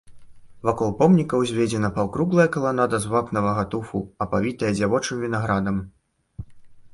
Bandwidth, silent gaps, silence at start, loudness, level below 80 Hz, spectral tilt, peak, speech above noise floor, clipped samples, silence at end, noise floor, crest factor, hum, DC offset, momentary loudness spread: 11.5 kHz; none; 0.1 s; -22 LUFS; -48 dBFS; -6.5 dB/octave; -4 dBFS; 22 dB; under 0.1%; 0.05 s; -44 dBFS; 18 dB; none; under 0.1%; 10 LU